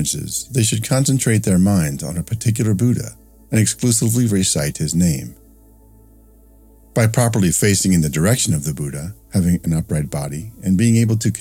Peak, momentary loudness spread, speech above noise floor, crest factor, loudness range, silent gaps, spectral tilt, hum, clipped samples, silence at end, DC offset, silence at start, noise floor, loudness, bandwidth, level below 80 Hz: 0 dBFS; 10 LU; 30 dB; 18 dB; 3 LU; none; -5 dB/octave; none; under 0.1%; 0 s; under 0.1%; 0 s; -47 dBFS; -18 LUFS; 17 kHz; -40 dBFS